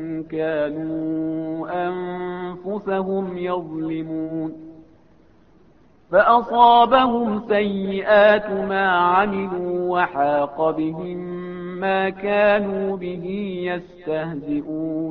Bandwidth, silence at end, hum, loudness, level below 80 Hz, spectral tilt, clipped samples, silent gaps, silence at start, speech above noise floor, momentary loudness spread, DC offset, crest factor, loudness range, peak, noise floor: 5.4 kHz; 0 s; none; -21 LUFS; -56 dBFS; -9 dB/octave; under 0.1%; none; 0 s; 34 dB; 14 LU; 0.1%; 20 dB; 10 LU; -2 dBFS; -54 dBFS